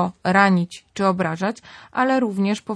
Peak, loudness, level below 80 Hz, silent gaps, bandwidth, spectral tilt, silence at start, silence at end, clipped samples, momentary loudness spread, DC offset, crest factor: -2 dBFS; -20 LUFS; -62 dBFS; none; 11 kHz; -6.5 dB/octave; 0 s; 0 s; under 0.1%; 12 LU; under 0.1%; 18 dB